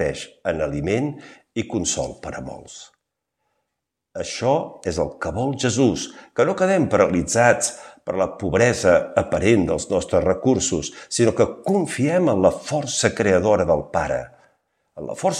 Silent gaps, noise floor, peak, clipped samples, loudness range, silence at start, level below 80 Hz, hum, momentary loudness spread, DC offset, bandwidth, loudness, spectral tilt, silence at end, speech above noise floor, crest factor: none; -81 dBFS; -2 dBFS; under 0.1%; 9 LU; 0 s; -46 dBFS; none; 14 LU; under 0.1%; 13 kHz; -21 LUFS; -4.5 dB/octave; 0 s; 60 dB; 20 dB